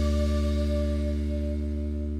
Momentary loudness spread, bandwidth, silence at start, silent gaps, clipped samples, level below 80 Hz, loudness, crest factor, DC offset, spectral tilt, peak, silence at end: 5 LU; 9.6 kHz; 0 s; none; under 0.1%; -28 dBFS; -28 LUFS; 10 dB; under 0.1%; -8 dB/octave; -16 dBFS; 0 s